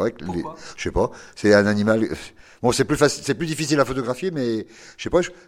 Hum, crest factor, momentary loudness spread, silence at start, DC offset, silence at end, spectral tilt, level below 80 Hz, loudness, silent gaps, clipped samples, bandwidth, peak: none; 22 dB; 13 LU; 0 s; under 0.1%; 0.15 s; -5 dB/octave; -42 dBFS; -22 LUFS; none; under 0.1%; 16 kHz; 0 dBFS